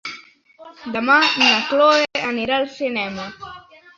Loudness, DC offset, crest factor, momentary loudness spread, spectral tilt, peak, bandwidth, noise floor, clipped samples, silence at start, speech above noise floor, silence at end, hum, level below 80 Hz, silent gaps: -17 LUFS; under 0.1%; 18 dB; 22 LU; -2.5 dB/octave; -2 dBFS; 7.8 kHz; -46 dBFS; under 0.1%; 0.05 s; 27 dB; 0.35 s; none; -60 dBFS; none